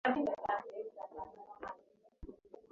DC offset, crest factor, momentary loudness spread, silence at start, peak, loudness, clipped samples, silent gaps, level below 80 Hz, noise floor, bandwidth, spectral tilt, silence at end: under 0.1%; 22 dB; 20 LU; 0.05 s; -20 dBFS; -41 LUFS; under 0.1%; none; -64 dBFS; -65 dBFS; 7.2 kHz; -3 dB/octave; 0.1 s